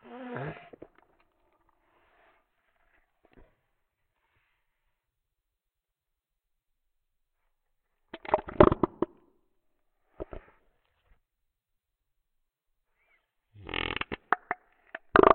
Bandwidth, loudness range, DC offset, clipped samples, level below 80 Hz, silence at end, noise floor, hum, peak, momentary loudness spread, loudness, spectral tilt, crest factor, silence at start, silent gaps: 4.4 kHz; 23 LU; under 0.1%; under 0.1%; -50 dBFS; 0 s; -87 dBFS; none; -6 dBFS; 25 LU; -29 LUFS; -9.5 dB/octave; 28 dB; 0.1 s; none